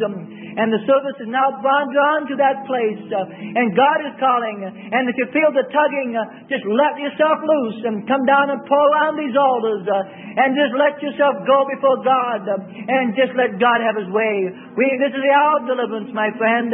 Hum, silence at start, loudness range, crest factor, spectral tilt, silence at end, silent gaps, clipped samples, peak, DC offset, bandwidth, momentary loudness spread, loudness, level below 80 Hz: none; 0 s; 2 LU; 16 dB; -10 dB/octave; 0 s; none; under 0.1%; -2 dBFS; under 0.1%; 3.9 kHz; 9 LU; -18 LUFS; -74 dBFS